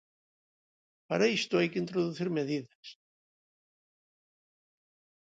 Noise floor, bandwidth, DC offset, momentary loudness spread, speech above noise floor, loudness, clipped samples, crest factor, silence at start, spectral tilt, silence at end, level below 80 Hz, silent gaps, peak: under -90 dBFS; 9 kHz; under 0.1%; 21 LU; over 59 dB; -31 LUFS; under 0.1%; 22 dB; 1.1 s; -5.5 dB/octave; 2.45 s; -80 dBFS; 2.75-2.83 s; -14 dBFS